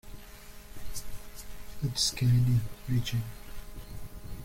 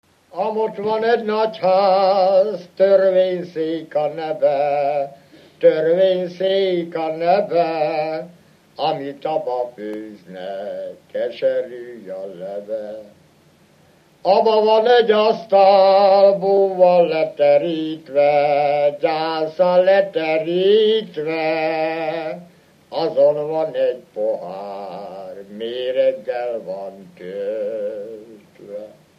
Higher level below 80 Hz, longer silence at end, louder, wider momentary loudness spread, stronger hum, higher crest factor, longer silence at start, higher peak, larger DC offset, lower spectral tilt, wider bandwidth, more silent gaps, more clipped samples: first, -44 dBFS vs -74 dBFS; second, 0 s vs 0.3 s; second, -29 LUFS vs -18 LUFS; first, 23 LU vs 17 LU; neither; about the same, 16 dB vs 18 dB; second, 0.05 s vs 0.35 s; second, -14 dBFS vs -2 dBFS; neither; second, -4.5 dB/octave vs -6.5 dB/octave; first, 16.5 kHz vs 6 kHz; neither; neither